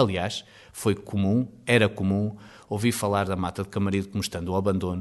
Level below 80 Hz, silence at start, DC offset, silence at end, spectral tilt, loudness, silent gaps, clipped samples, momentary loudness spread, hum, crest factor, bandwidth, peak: -54 dBFS; 0 s; under 0.1%; 0 s; -5.5 dB/octave; -26 LUFS; none; under 0.1%; 10 LU; none; 20 dB; 12 kHz; -6 dBFS